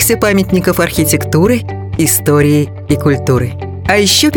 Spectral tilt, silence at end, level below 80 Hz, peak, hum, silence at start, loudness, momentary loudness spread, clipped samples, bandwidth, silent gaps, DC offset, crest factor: -4.5 dB/octave; 0 s; -34 dBFS; 0 dBFS; none; 0 s; -12 LUFS; 6 LU; under 0.1%; 17.5 kHz; none; under 0.1%; 12 dB